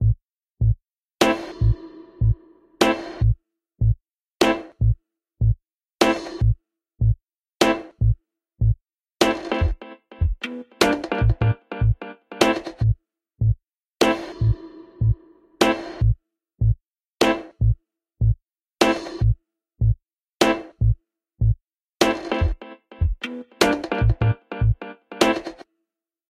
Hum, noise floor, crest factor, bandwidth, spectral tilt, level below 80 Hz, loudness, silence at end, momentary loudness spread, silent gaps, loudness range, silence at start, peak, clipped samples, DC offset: none; -82 dBFS; 22 dB; 15 kHz; -6 dB/octave; -30 dBFS; -23 LUFS; 0.8 s; 9 LU; none; 1 LU; 0 s; 0 dBFS; under 0.1%; under 0.1%